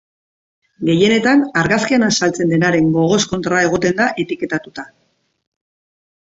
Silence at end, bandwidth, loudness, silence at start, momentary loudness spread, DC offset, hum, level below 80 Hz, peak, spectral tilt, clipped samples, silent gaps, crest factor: 1.45 s; 8 kHz; -15 LUFS; 0.8 s; 9 LU; under 0.1%; none; -50 dBFS; -2 dBFS; -4.5 dB/octave; under 0.1%; none; 16 dB